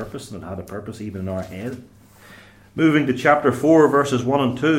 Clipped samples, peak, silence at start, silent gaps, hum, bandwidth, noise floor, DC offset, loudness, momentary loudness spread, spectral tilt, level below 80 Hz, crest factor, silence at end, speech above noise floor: under 0.1%; -2 dBFS; 0 s; none; none; 15.5 kHz; -46 dBFS; under 0.1%; -18 LUFS; 18 LU; -6.5 dB/octave; -56 dBFS; 18 dB; 0 s; 27 dB